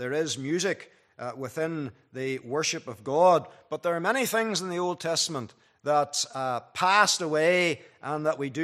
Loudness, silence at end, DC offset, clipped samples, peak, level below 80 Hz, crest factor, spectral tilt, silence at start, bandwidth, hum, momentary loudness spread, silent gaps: -27 LUFS; 0 s; under 0.1%; under 0.1%; -6 dBFS; -76 dBFS; 22 dB; -3 dB/octave; 0 s; 14.5 kHz; none; 15 LU; none